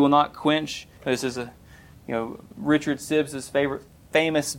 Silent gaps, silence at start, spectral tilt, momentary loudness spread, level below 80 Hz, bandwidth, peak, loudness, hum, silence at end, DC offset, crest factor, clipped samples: none; 0 s; -4.5 dB/octave; 13 LU; -56 dBFS; 16.5 kHz; -6 dBFS; -25 LUFS; none; 0 s; under 0.1%; 18 dB; under 0.1%